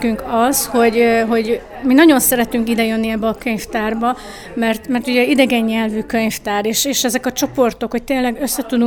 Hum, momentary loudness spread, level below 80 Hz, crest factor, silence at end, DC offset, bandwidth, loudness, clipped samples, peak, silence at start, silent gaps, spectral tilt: none; 8 LU; -42 dBFS; 16 dB; 0 s; under 0.1%; over 20 kHz; -16 LUFS; under 0.1%; 0 dBFS; 0 s; none; -3.5 dB/octave